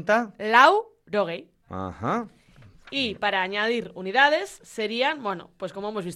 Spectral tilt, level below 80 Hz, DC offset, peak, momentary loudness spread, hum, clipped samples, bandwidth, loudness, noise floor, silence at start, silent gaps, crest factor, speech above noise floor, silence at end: -4 dB/octave; -62 dBFS; under 0.1%; -4 dBFS; 17 LU; none; under 0.1%; 13 kHz; -24 LUFS; -52 dBFS; 0 s; none; 22 dB; 28 dB; 0 s